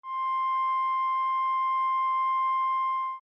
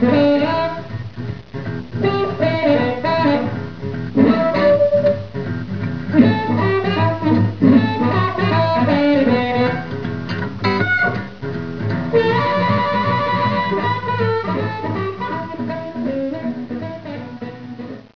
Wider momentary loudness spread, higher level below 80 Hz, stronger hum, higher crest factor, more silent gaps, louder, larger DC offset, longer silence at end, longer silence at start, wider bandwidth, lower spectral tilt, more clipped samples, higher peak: second, 2 LU vs 13 LU; second, under -90 dBFS vs -48 dBFS; neither; second, 4 dB vs 18 dB; neither; second, -27 LUFS vs -18 LUFS; second, under 0.1% vs 1%; about the same, 0.05 s vs 0.05 s; about the same, 0.05 s vs 0 s; about the same, 5.6 kHz vs 5.4 kHz; second, 2 dB/octave vs -8.5 dB/octave; neither; second, -22 dBFS vs 0 dBFS